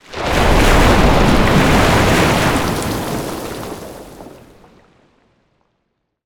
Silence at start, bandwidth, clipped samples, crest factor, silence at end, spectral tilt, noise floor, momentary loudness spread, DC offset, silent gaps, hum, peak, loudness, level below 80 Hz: 0.1 s; over 20 kHz; under 0.1%; 14 dB; 1.95 s; -5 dB/octave; -70 dBFS; 17 LU; under 0.1%; none; none; -2 dBFS; -14 LUFS; -22 dBFS